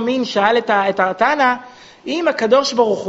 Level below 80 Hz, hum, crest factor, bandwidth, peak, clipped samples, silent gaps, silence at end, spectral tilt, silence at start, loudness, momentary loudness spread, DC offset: -62 dBFS; none; 16 dB; 8 kHz; 0 dBFS; under 0.1%; none; 0 s; -1.5 dB/octave; 0 s; -16 LUFS; 8 LU; under 0.1%